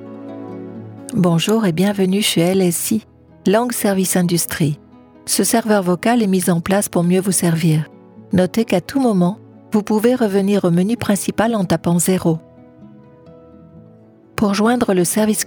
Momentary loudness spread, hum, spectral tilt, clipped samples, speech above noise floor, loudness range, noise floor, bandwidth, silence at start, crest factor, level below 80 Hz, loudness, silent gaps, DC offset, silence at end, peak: 10 LU; none; -5 dB/octave; under 0.1%; 30 dB; 4 LU; -46 dBFS; over 20 kHz; 0 s; 16 dB; -52 dBFS; -17 LUFS; none; under 0.1%; 0 s; -2 dBFS